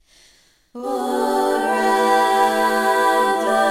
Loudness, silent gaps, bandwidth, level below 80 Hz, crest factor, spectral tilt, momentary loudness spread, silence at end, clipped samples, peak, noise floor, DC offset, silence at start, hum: -18 LUFS; none; 16.5 kHz; -58 dBFS; 14 dB; -2.5 dB/octave; 7 LU; 0 s; under 0.1%; -4 dBFS; -55 dBFS; under 0.1%; 0.75 s; none